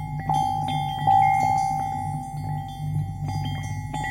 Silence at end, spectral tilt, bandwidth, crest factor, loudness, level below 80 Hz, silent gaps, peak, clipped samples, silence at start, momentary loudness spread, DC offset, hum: 0 s; -5.5 dB/octave; 16.5 kHz; 16 dB; -25 LUFS; -44 dBFS; none; -10 dBFS; under 0.1%; 0 s; 12 LU; under 0.1%; none